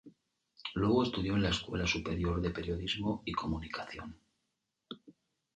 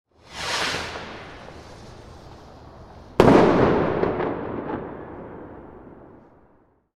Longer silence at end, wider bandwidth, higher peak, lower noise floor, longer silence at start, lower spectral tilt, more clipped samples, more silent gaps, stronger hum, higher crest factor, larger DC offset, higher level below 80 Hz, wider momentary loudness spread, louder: second, 0.45 s vs 1.05 s; second, 9.2 kHz vs 15 kHz; second, -16 dBFS vs -2 dBFS; first, -84 dBFS vs -59 dBFS; second, 0.05 s vs 0.3 s; about the same, -5.5 dB/octave vs -6 dB/octave; neither; neither; neither; about the same, 20 dB vs 24 dB; neither; about the same, -48 dBFS vs -44 dBFS; second, 19 LU vs 28 LU; second, -34 LUFS vs -21 LUFS